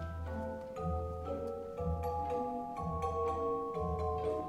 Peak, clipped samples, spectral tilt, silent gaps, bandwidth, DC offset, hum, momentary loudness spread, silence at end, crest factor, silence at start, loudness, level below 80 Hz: -24 dBFS; under 0.1%; -8.5 dB/octave; none; 12 kHz; under 0.1%; none; 6 LU; 0 s; 14 dB; 0 s; -38 LUFS; -48 dBFS